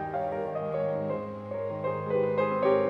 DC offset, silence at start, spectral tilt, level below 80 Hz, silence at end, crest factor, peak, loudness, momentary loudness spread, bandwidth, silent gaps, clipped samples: under 0.1%; 0 s; -9 dB/octave; -66 dBFS; 0 s; 16 dB; -14 dBFS; -30 LUFS; 8 LU; 5.4 kHz; none; under 0.1%